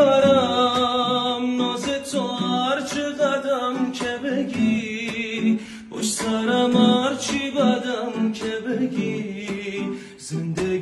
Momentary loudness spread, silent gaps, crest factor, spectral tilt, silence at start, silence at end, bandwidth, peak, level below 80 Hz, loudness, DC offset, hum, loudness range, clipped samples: 11 LU; none; 16 dB; -4.5 dB/octave; 0 s; 0 s; 12.5 kHz; -6 dBFS; -58 dBFS; -22 LUFS; under 0.1%; none; 3 LU; under 0.1%